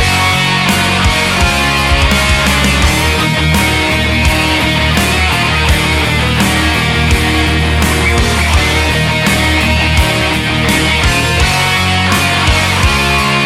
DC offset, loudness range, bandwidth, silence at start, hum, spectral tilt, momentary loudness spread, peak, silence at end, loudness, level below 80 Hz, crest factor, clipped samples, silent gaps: under 0.1%; 1 LU; 16 kHz; 0 s; none; -4 dB/octave; 1 LU; 0 dBFS; 0 s; -10 LUFS; -18 dBFS; 10 dB; under 0.1%; none